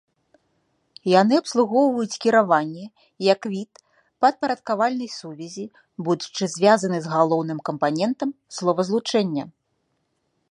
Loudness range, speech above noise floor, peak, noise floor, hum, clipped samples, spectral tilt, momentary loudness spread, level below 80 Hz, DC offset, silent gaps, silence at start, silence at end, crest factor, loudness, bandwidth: 4 LU; 51 dB; -2 dBFS; -72 dBFS; none; under 0.1%; -5 dB/octave; 16 LU; -72 dBFS; under 0.1%; none; 1.05 s; 1 s; 20 dB; -22 LUFS; 11 kHz